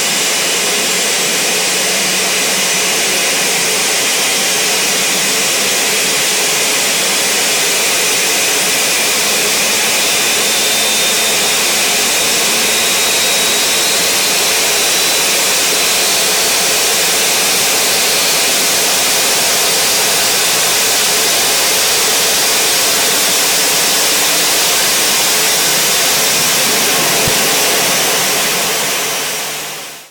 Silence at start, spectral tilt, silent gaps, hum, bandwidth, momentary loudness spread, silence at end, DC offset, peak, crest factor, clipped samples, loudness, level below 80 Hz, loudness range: 0 s; 0.5 dB/octave; none; none; over 20 kHz; 2 LU; 0.05 s; under 0.1%; -6 dBFS; 8 dB; under 0.1%; -10 LUFS; -50 dBFS; 1 LU